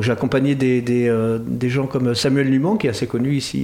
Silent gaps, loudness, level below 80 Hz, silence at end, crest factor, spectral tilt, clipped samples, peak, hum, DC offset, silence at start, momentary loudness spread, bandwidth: none; -19 LUFS; -50 dBFS; 0 s; 12 dB; -6.5 dB/octave; under 0.1%; -6 dBFS; none; under 0.1%; 0 s; 4 LU; 15.5 kHz